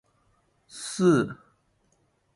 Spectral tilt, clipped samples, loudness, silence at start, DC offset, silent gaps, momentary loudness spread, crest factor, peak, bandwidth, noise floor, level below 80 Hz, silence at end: -6 dB/octave; under 0.1%; -25 LUFS; 0.75 s; under 0.1%; none; 24 LU; 20 dB; -10 dBFS; 11.5 kHz; -69 dBFS; -66 dBFS; 1 s